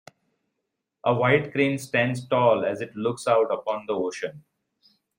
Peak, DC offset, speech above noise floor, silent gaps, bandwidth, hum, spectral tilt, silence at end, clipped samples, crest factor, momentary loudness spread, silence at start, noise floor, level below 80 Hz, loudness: -6 dBFS; under 0.1%; 57 dB; none; 16 kHz; none; -6 dB/octave; 0.8 s; under 0.1%; 20 dB; 8 LU; 1.05 s; -81 dBFS; -68 dBFS; -24 LUFS